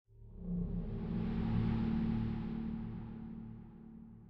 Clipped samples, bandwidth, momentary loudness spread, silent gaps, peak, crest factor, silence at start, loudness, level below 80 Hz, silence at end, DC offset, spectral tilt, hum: under 0.1%; 5.4 kHz; 18 LU; none; -24 dBFS; 16 dB; 0.1 s; -39 LUFS; -46 dBFS; 0 s; under 0.1%; -10.5 dB/octave; none